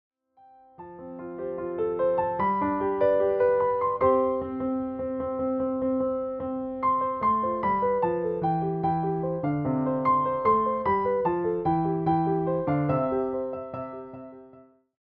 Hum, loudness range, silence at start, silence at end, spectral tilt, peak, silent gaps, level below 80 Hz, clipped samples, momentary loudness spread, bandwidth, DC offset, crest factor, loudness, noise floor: none; 3 LU; 0.8 s; 0.4 s; -11.5 dB/octave; -10 dBFS; none; -58 dBFS; under 0.1%; 12 LU; 4.5 kHz; under 0.1%; 16 dB; -26 LUFS; -57 dBFS